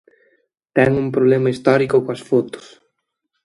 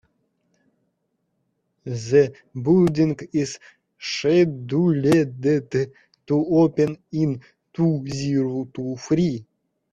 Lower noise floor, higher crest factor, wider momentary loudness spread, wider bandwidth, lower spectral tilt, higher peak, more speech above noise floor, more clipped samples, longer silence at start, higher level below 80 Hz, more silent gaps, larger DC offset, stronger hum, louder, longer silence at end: about the same, -74 dBFS vs -73 dBFS; about the same, 18 dB vs 18 dB; second, 7 LU vs 13 LU; about the same, 11.5 kHz vs 12 kHz; about the same, -7.5 dB/octave vs -7 dB/octave; first, 0 dBFS vs -4 dBFS; first, 58 dB vs 53 dB; neither; second, 0.75 s vs 1.85 s; first, -52 dBFS vs -58 dBFS; neither; neither; neither; first, -17 LUFS vs -22 LUFS; first, 0.85 s vs 0.5 s